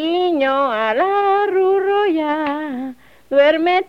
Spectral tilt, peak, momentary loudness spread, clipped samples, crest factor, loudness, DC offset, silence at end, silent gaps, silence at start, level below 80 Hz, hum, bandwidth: -5 dB/octave; -4 dBFS; 9 LU; under 0.1%; 12 dB; -17 LUFS; 0.2%; 0.05 s; none; 0 s; -62 dBFS; none; 6.2 kHz